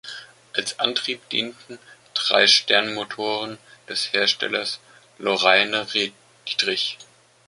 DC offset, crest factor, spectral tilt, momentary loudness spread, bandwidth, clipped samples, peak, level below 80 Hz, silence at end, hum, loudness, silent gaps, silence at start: under 0.1%; 22 dB; -1 dB/octave; 17 LU; 11.5 kHz; under 0.1%; -2 dBFS; -72 dBFS; 0.45 s; none; -21 LUFS; none; 0.05 s